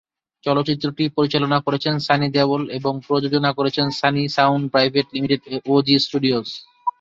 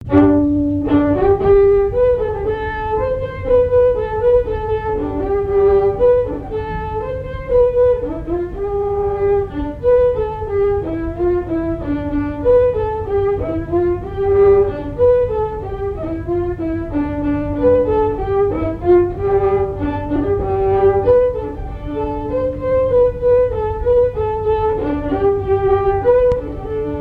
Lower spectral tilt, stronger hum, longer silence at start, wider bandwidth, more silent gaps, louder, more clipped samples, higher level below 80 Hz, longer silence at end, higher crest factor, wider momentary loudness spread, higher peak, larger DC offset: second, -6.5 dB/octave vs -10 dB/octave; neither; first, 0.45 s vs 0 s; first, 7.6 kHz vs 4.6 kHz; neither; about the same, -19 LUFS vs -17 LUFS; neither; second, -58 dBFS vs -30 dBFS; about the same, 0.1 s vs 0 s; about the same, 18 dB vs 16 dB; second, 6 LU vs 9 LU; about the same, -2 dBFS vs 0 dBFS; neither